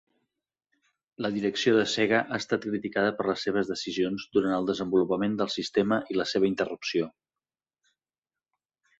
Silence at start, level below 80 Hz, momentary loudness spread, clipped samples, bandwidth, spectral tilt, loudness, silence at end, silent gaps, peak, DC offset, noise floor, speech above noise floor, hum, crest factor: 1.2 s; -66 dBFS; 6 LU; under 0.1%; 8 kHz; -5 dB/octave; -27 LUFS; 1.9 s; none; -8 dBFS; under 0.1%; under -90 dBFS; over 63 dB; none; 20 dB